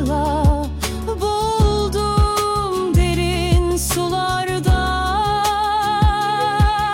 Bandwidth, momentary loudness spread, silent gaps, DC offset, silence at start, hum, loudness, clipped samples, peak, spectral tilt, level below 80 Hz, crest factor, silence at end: 16.5 kHz; 3 LU; none; under 0.1%; 0 s; none; -18 LUFS; under 0.1%; -6 dBFS; -5 dB/octave; -24 dBFS; 12 dB; 0 s